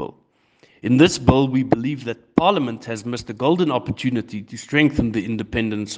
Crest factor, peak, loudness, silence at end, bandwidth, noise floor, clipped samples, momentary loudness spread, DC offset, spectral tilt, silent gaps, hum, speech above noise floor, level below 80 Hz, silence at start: 20 dB; 0 dBFS; -20 LUFS; 0 s; 9.8 kHz; -59 dBFS; under 0.1%; 13 LU; under 0.1%; -6 dB/octave; none; none; 40 dB; -44 dBFS; 0 s